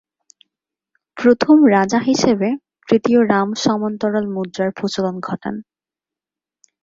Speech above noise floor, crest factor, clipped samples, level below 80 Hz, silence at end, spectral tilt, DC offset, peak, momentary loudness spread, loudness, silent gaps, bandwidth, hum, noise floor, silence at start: 73 dB; 16 dB; under 0.1%; -58 dBFS; 1.2 s; -5.5 dB/octave; under 0.1%; -2 dBFS; 14 LU; -17 LUFS; none; 7.8 kHz; none; -89 dBFS; 1.15 s